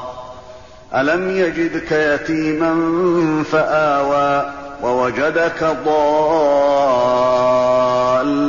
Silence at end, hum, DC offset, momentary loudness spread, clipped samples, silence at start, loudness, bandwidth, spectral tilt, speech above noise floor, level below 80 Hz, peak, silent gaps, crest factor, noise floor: 0 s; none; 0.5%; 6 LU; under 0.1%; 0 s; -16 LUFS; 7.2 kHz; -4 dB/octave; 23 dB; -48 dBFS; -4 dBFS; none; 12 dB; -39 dBFS